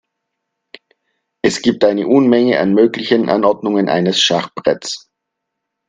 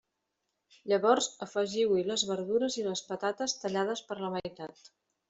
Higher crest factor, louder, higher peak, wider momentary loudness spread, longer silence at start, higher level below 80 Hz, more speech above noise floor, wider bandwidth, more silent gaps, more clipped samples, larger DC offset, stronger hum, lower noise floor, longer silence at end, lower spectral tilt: second, 16 dB vs 22 dB; first, -14 LUFS vs -31 LUFS; first, 0 dBFS vs -10 dBFS; second, 7 LU vs 11 LU; first, 1.45 s vs 0.85 s; first, -56 dBFS vs -74 dBFS; first, 63 dB vs 52 dB; first, 9.8 kHz vs 8.2 kHz; neither; neither; neither; neither; second, -77 dBFS vs -83 dBFS; first, 0.9 s vs 0.6 s; about the same, -4.5 dB/octave vs -3.5 dB/octave